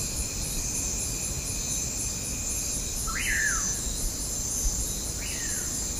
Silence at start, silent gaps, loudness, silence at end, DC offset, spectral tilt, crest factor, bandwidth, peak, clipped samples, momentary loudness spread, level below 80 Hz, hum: 0 s; none; -28 LUFS; 0 s; under 0.1%; -1.5 dB/octave; 16 dB; 15.5 kHz; -14 dBFS; under 0.1%; 5 LU; -36 dBFS; none